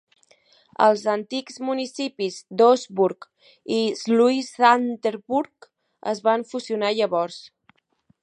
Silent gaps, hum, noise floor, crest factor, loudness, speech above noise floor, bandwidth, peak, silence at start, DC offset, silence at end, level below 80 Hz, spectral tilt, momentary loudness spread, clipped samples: none; none; -65 dBFS; 20 dB; -22 LUFS; 43 dB; 10.5 kHz; -2 dBFS; 0.8 s; under 0.1%; 0.75 s; -76 dBFS; -4.5 dB/octave; 13 LU; under 0.1%